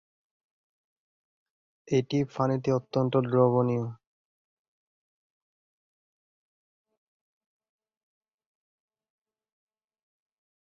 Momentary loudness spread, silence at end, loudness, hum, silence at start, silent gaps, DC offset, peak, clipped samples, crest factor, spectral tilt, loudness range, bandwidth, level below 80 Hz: 6 LU; 6.65 s; -27 LUFS; none; 1.85 s; none; under 0.1%; -10 dBFS; under 0.1%; 22 dB; -8 dB/octave; 5 LU; 7 kHz; -68 dBFS